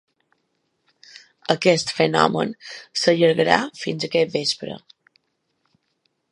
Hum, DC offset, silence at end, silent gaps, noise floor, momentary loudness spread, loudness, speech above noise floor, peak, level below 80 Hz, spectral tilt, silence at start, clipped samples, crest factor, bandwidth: none; under 0.1%; 1.55 s; none; -72 dBFS; 14 LU; -20 LUFS; 51 dB; 0 dBFS; -62 dBFS; -4.5 dB/octave; 1.5 s; under 0.1%; 22 dB; 11.5 kHz